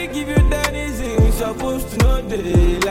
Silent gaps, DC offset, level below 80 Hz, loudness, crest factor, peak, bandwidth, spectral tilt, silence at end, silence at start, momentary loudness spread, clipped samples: none; under 0.1%; -20 dBFS; -19 LUFS; 14 dB; -4 dBFS; 16.5 kHz; -6 dB/octave; 0 s; 0 s; 6 LU; under 0.1%